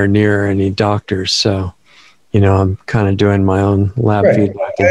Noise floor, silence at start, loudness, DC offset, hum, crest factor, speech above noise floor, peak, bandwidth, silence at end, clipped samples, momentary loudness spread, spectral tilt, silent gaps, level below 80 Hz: -47 dBFS; 0 s; -14 LUFS; 0.3%; none; 12 dB; 34 dB; 0 dBFS; 10.5 kHz; 0 s; under 0.1%; 5 LU; -6 dB/octave; none; -46 dBFS